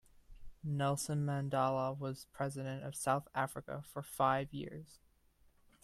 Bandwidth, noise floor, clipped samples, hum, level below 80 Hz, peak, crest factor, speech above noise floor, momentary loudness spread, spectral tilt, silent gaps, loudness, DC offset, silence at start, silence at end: 14.5 kHz; -69 dBFS; under 0.1%; none; -64 dBFS; -18 dBFS; 20 dB; 32 dB; 12 LU; -5.5 dB/octave; none; -38 LUFS; under 0.1%; 0.3 s; 0.9 s